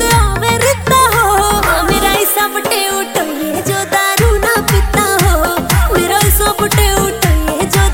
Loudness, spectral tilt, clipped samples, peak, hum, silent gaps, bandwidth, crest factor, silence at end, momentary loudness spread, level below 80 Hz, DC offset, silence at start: -12 LUFS; -3.5 dB/octave; under 0.1%; 0 dBFS; none; none; 17 kHz; 12 dB; 0 s; 4 LU; -18 dBFS; 0.4%; 0 s